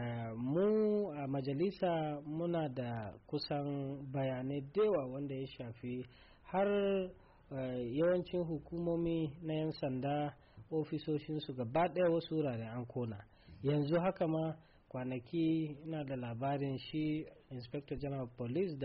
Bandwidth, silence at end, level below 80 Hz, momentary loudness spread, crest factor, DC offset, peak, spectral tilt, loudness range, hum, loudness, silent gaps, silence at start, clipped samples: 5.4 kHz; 0 s; -64 dBFS; 11 LU; 12 dB; under 0.1%; -24 dBFS; -6.5 dB/octave; 3 LU; none; -38 LUFS; none; 0 s; under 0.1%